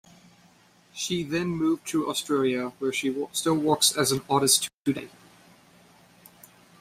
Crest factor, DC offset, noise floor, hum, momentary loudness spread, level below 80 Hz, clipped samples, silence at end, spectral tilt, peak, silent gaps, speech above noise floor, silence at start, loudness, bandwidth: 20 dB; under 0.1%; -58 dBFS; none; 9 LU; -64 dBFS; under 0.1%; 1.75 s; -3 dB/octave; -8 dBFS; 4.74-4.85 s; 33 dB; 0.95 s; -25 LUFS; 16 kHz